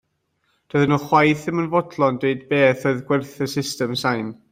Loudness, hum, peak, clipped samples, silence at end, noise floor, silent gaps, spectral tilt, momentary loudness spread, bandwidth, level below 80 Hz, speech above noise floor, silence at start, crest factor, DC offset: -20 LUFS; none; -2 dBFS; under 0.1%; 0.2 s; -69 dBFS; none; -6 dB/octave; 8 LU; 16 kHz; -58 dBFS; 49 dB; 0.75 s; 18 dB; under 0.1%